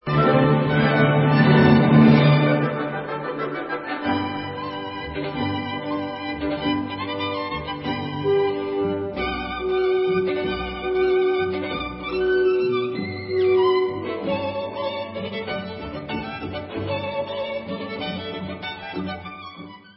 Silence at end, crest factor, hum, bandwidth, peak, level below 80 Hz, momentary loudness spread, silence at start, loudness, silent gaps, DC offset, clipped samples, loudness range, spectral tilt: 0.2 s; 20 dB; none; 5.8 kHz; -2 dBFS; -46 dBFS; 13 LU; 0.05 s; -22 LUFS; none; under 0.1%; under 0.1%; 11 LU; -11.5 dB/octave